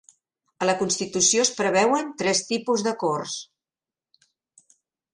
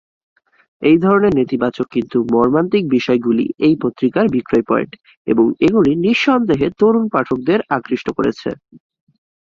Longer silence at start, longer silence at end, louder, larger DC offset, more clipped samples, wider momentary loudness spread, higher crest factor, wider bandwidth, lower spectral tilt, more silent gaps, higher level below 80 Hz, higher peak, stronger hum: second, 0.6 s vs 0.8 s; first, 1.7 s vs 1 s; second, -22 LUFS vs -16 LUFS; neither; neither; about the same, 8 LU vs 6 LU; first, 22 dB vs 14 dB; first, 11.5 kHz vs 7.2 kHz; second, -2.5 dB/octave vs -7.5 dB/octave; second, none vs 5.17-5.25 s; second, -66 dBFS vs -50 dBFS; about the same, -4 dBFS vs -2 dBFS; neither